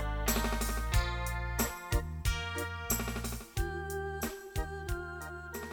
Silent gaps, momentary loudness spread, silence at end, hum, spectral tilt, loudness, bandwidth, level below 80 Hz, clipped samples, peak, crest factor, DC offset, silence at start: none; 7 LU; 0 s; none; -4 dB/octave; -36 LUFS; 19.5 kHz; -38 dBFS; under 0.1%; -16 dBFS; 20 dB; under 0.1%; 0 s